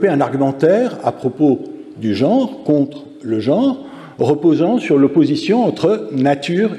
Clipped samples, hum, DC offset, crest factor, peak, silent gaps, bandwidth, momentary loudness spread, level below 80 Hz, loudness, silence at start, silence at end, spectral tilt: under 0.1%; none; under 0.1%; 14 dB; -2 dBFS; none; 10 kHz; 9 LU; -62 dBFS; -16 LUFS; 0 s; 0 s; -7.5 dB/octave